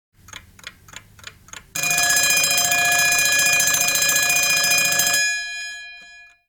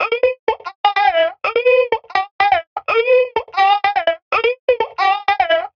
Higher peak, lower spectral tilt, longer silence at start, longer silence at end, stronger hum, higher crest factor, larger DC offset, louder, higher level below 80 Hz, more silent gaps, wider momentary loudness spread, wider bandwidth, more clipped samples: second, -4 dBFS vs 0 dBFS; second, 1 dB/octave vs -3 dB/octave; first, 0.65 s vs 0 s; first, 0.25 s vs 0.1 s; neither; about the same, 18 dB vs 16 dB; neither; about the same, -16 LUFS vs -16 LUFS; about the same, -54 dBFS vs -56 dBFS; second, none vs 0.39-0.47 s, 0.75-0.84 s, 2.31-2.39 s, 2.67-2.76 s, 4.22-4.31 s, 4.59-4.68 s; first, 15 LU vs 5 LU; first, 19.5 kHz vs 6.6 kHz; neither